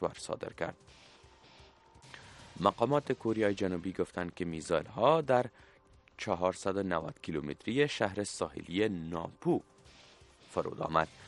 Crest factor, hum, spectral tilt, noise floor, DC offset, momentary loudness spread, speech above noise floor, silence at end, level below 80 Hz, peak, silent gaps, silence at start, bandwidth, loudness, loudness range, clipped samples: 24 dB; none; -5.5 dB/octave; -59 dBFS; under 0.1%; 12 LU; 26 dB; 0 s; -64 dBFS; -10 dBFS; none; 0 s; 11.5 kHz; -34 LUFS; 3 LU; under 0.1%